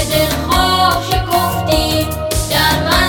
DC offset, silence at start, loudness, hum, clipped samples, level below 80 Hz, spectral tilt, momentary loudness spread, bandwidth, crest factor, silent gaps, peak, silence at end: under 0.1%; 0 s; -14 LUFS; none; under 0.1%; -24 dBFS; -4 dB/octave; 5 LU; 19.5 kHz; 14 dB; none; 0 dBFS; 0 s